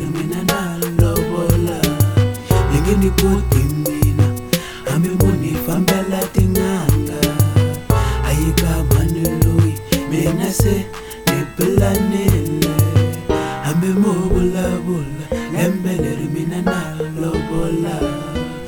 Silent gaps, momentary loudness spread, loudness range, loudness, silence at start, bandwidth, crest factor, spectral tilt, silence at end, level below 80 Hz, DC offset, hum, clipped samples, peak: none; 6 LU; 3 LU; -17 LUFS; 0 s; 19 kHz; 16 dB; -6 dB/octave; 0 s; -26 dBFS; under 0.1%; none; under 0.1%; 0 dBFS